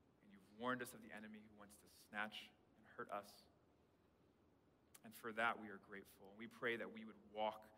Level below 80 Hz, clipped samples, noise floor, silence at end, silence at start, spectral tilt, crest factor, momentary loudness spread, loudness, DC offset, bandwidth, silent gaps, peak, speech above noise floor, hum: -86 dBFS; under 0.1%; -76 dBFS; 0 s; 0.2 s; -4 dB/octave; 24 dB; 21 LU; -49 LUFS; under 0.1%; 16 kHz; none; -28 dBFS; 26 dB; none